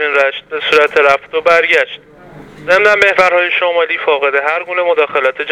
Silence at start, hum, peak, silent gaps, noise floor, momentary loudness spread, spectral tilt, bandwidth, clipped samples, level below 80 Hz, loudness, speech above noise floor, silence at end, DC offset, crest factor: 0 s; none; 0 dBFS; none; -35 dBFS; 7 LU; -2.5 dB/octave; 13 kHz; 0.2%; -52 dBFS; -11 LUFS; 23 dB; 0 s; under 0.1%; 12 dB